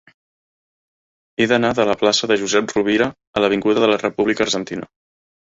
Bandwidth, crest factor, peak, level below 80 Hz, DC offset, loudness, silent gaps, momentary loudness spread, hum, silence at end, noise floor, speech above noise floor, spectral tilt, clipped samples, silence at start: 8 kHz; 18 dB; -2 dBFS; -56 dBFS; under 0.1%; -18 LUFS; 3.27-3.33 s; 6 LU; none; 0.55 s; under -90 dBFS; over 72 dB; -3.5 dB/octave; under 0.1%; 1.4 s